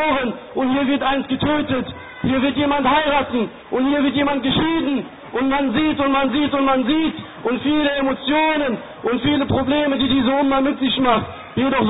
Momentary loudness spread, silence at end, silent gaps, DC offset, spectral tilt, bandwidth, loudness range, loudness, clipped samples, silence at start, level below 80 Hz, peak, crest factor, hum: 7 LU; 0 s; none; under 0.1%; -10.5 dB/octave; 4 kHz; 1 LU; -19 LUFS; under 0.1%; 0 s; -44 dBFS; -4 dBFS; 14 dB; none